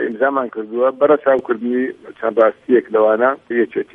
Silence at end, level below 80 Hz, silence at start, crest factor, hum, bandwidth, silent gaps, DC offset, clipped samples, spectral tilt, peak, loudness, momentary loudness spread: 0.1 s; -66 dBFS; 0 s; 16 dB; none; 3.8 kHz; none; under 0.1%; under 0.1%; -8 dB/octave; 0 dBFS; -17 LUFS; 8 LU